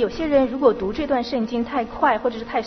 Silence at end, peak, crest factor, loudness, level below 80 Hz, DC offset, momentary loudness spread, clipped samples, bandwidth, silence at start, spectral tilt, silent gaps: 0 s; -4 dBFS; 16 dB; -21 LUFS; -44 dBFS; under 0.1%; 5 LU; under 0.1%; 6.4 kHz; 0 s; -6.5 dB/octave; none